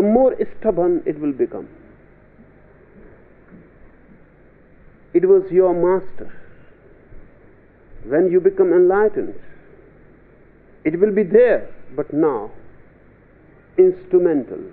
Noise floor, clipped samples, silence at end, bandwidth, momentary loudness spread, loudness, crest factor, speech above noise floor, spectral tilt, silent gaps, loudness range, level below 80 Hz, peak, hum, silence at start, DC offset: -49 dBFS; under 0.1%; 0.05 s; 3.8 kHz; 14 LU; -17 LUFS; 18 dB; 32 dB; -8.5 dB/octave; none; 6 LU; -48 dBFS; -2 dBFS; none; 0 s; under 0.1%